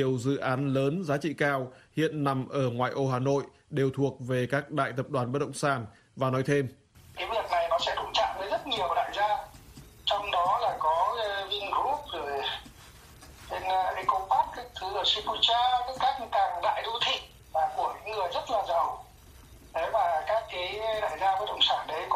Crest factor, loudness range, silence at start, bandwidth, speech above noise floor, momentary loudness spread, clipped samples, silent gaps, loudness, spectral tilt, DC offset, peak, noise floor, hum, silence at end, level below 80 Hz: 20 dB; 4 LU; 0 s; 15 kHz; 24 dB; 7 LU; under 0.1%; none; -29 LUFS; -5 dB/octave; under 0.1%; -10 dBFS; -52 dBFS; none; 0 s; -58 dBFS